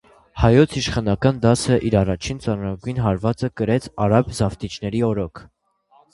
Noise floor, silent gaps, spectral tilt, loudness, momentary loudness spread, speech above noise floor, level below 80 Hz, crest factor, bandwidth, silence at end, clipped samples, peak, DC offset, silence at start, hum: -57 dBFS; none; -6.5 dB/octave; -20 LUFS; 9 LU; 38 dB; -38 dBFS; 20 dB; 11.5 kHz; 0.7 s; under 0.1%; 0 dBFS; under 0.1%; 0.35 s; none